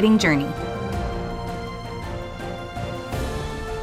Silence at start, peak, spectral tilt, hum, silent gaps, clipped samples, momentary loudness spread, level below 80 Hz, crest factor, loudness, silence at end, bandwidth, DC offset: 0 s; -6 dBFS; -5.5 dB/octave; none; none; under 0.1%; 13 LU; -36 dBFS; 20 dB; -26 LUFS; 0 s; 15.5 kHz; under 0.1%